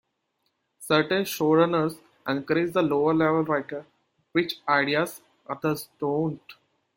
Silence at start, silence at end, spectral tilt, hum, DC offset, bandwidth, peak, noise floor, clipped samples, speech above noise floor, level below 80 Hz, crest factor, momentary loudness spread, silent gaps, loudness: 0.8 s; 0.45 s; -5.5 dB/octave; none; under 0.1%; 16.5 kHz; -6 dBFS; -76 dBFS; under 0.1%; 51 dB; -68 dBFS; 20 dB; 15 LU; none; -25 LUFS